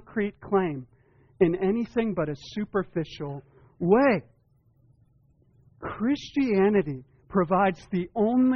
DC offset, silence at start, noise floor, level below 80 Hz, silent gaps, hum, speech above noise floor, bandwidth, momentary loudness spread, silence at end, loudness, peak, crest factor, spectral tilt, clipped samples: under 0.1%; 0.1 s; -64 dBFS; -56 dBFS; none; none; 39 dB; 6.6 kHz; 14 LU; 0 s; -26 LUFS; -8 dBFS; 18 dB; -6.5 dB/octave; under 0.1%